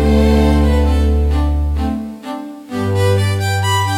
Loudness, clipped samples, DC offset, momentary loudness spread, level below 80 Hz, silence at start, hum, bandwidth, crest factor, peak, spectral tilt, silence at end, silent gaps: -15 LUFS; under 0.1%; under 0.1%; 14 LU; -18 dBFS; 0 s; none; 15.5 kHz; 10 dB; -4 dBFS; -6.5 dB/octave; 0 s; none